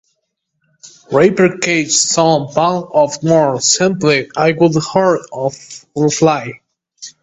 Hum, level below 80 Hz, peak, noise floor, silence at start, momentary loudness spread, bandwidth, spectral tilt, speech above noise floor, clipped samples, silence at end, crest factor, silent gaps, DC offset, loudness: none; -54 dBFS; 0 dBFS; -71 dBFS; 0.85 s; 10 LU; 8.4 kHz; -4 dB/octave; 57 dB; under 0.1%; 0.15 s; 14 dB; none; under 0.1%; -13 LUFS